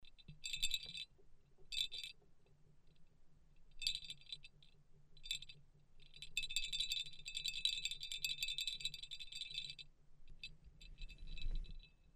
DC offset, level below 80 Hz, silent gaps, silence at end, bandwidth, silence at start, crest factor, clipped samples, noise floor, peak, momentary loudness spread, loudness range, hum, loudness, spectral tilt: under 0.1%; -54 dBFS; none; 0.05 s; 15 kHz; 0 s; 28 dB; under 0.1%; -66 dBFS; -18 dBFS; 19 LU; 8 LU; none; -43 LUFS; 0.5 dB/octave